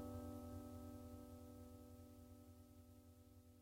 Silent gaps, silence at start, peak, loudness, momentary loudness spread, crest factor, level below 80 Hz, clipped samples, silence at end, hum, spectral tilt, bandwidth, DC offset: none; 0 s; -40 dBFS; -59 LUFS; 13 LU; 16 dB; -68 dBFS; under 0.1%; 0 s; none; -7 dB/octave; 16 kHz; under 0.1%